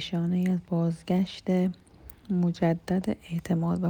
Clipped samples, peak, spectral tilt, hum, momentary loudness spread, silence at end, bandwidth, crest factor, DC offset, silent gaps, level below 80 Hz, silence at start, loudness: under 0.1%; -12 dBFS; -8 dB/octave; none; 6 LU; 0 s; over 20 kHz; 14 dB; under 0.1%; none; -56 dBFS; 0 s; -28 LUFS